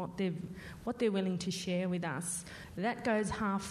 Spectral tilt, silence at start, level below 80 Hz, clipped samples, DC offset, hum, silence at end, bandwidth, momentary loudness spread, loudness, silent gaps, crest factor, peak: -5 dB/octave; 0 s; -60 dBFS; under 0.1%; under 0.1%; none; 0 s; 13.5 kHz; 10 LU; -35 LUFS; none; 14 dB; -22 dBFS